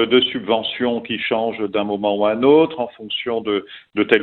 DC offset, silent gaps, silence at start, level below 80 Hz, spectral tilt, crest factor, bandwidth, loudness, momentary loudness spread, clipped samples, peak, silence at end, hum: under 0.1%; none; 0 s; -58 dBFS; -7.5 dB/octave; 18 dB; 4.3 kHz; -19 LUFS; 10 LU; under 0.1%; 0 dBFS; 0 s; none